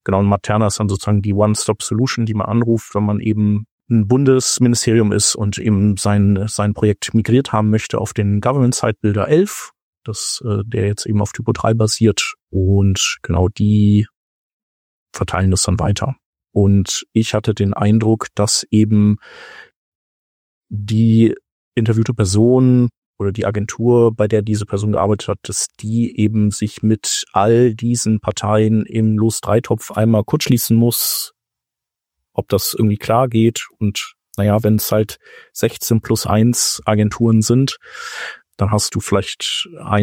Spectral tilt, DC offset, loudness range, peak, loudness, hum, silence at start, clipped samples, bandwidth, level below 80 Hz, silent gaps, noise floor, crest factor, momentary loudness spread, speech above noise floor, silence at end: -5.5 dB/octave; under 0.1%; 3 LU; -2 dBFS; -16 LUFS; none; 0.05 s; under 0.1%; 17 kHz; -44 dBFS; 3.72-3.78 s, 9.82-10.02 s, 12.42-12.47 s, 14.16-15.06 s, 16.25-16.33 s, 19.76-20.62 s, 21.52-21.72 s, 22.97-23.13 s; -85 dBFS; 14 dB; 8 LU; 69 dB; 0 s